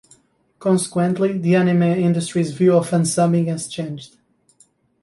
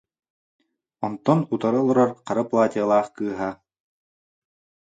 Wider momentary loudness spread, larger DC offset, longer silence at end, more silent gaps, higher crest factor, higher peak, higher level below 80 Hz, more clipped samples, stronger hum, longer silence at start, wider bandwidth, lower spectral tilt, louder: about the same, 10 LU vs 11 LU; neither; second, 0.95 s vs 1.35 s; neither; second, 14 dB vs 20 dB; about the same, -4 dBFS vs -4 dBFS; about the same, -62 dBFS vs -66 dBFS; neither; neither; second, 0.6 s vs 1 s; first, 11.5 kHz vs 9 kHz; second, -6.5 dB/octave vs -8 dB/octave; first, -18 LUFS vs -22 LUFS